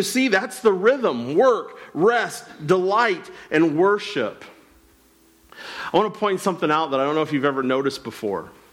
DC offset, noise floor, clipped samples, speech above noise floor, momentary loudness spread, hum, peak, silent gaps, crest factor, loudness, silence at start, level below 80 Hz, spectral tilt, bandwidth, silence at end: under 0.1%; -56 dBFS; under 0.1%; 35 dB; 11 LU; none; -6 dBFS; none; 16 dB; -21 LUFS; 0 s; -64 dBFS; -5 dB/octave; 16.5 kHz; 0.25 s